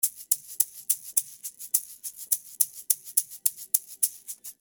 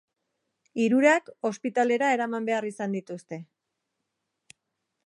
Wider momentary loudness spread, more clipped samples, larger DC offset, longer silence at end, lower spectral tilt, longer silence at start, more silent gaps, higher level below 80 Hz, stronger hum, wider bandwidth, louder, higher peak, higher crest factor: second, 14 LU vs 17 LU; neither; neither; second, 0.1 s vs 1.6 s; second, 4 dB/octave vs -5 dB/octave; second, 0.05 s vs 0.75 s; neither; first, -78 dBFS vs -84 dBFS; neither; first, over 20 kHz vs 11.5 kHz; about the same, -26 LUFS vs -25 LUFS; first, -2 dBFS vs -6 dBFS; first, 30 dB vs 22 dB